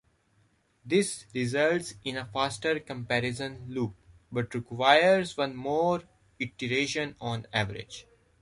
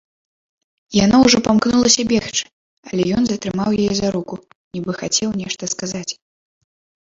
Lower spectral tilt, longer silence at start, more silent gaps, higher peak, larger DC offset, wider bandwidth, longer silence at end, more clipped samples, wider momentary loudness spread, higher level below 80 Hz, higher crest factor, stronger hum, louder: about the same, -4.5 dB/octave vs -4 dB/octave; about the same, 0.85 s vs 0.9 s; second, none vs 2.53-2.83 s, 4.55-4.71 s; second, -6 dBFS vs 0 dBFS; neither; first, 11.5 kHz vs 7.8 kHz; second, 0.4 s vs 0.95 s; neither; second, 13 LU vs 16 LU; second, -62 dBFS vs -48 dBFS; about the same, 22 dB vs 20 dB; neither; second, -29 LUFS vs -17 LUFS